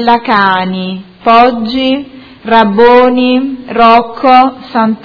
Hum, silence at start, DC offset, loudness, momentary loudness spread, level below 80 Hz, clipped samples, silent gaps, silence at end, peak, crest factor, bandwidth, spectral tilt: none; 0 s; under 0.1%; -8 LUFS; 11 LU; -42 dBFS; 2%; none; 0.05 s; 0 dBFS; 8 dB; 5.4 kHz; -7.5 dB/octave